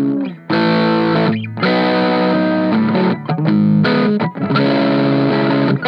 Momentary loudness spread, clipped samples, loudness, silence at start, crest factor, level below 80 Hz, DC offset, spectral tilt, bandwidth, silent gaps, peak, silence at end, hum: 5 LU; under 0.1%; -15 LUFS; 0 s; 12 dB; -62 dBFS; under 0.1%; -9 dB/octave; 5.8 kHz; none; -2 dBFS; 0 s; none